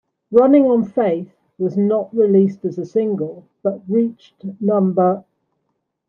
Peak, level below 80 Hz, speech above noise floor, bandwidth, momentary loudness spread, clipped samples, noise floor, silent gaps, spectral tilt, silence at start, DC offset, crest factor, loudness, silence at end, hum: -2 dBFS; -68 dBFS; 56 dB; 6.6 kHz; 13 LU; under 0.1%; -72 dBFS; none; -10.5 dB/octave; 0.3 s; under 0.1%; 16 dB; -18 LUFS; 0.9 s; none